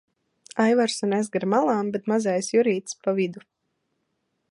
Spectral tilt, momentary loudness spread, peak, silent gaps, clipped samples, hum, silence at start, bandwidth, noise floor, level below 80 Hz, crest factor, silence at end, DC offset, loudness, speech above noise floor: -5 dB/octave; 6 LU; -6 dBFS; none; under 0.1%; none; 0.55 s; 11.5 kHz; -76 dBFS; -76 dBFS; 18 dB; 1.1 s; under 0.1%; -24 LUFS; 53 dB